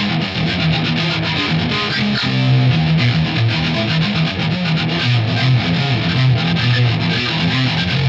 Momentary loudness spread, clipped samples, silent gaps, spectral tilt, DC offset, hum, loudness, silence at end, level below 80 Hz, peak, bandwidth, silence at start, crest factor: 3 LU; under 0.1%; none; -6.5 dB/octave; under 0.1%; none; -16 LUFS; 0 s; -40 dBFS; -4 dBFS; 7.6 kHz; 0 s; 12 dB